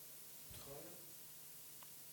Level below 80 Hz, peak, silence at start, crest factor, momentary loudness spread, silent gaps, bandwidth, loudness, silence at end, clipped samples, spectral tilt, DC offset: -76 dBFS; -40 dBFS; 0 s; 14 dB; 2 LU; none; 19 kHz; -53 LUFS; 0 s; under 0.1%; -2 dB/octave; under 0.1%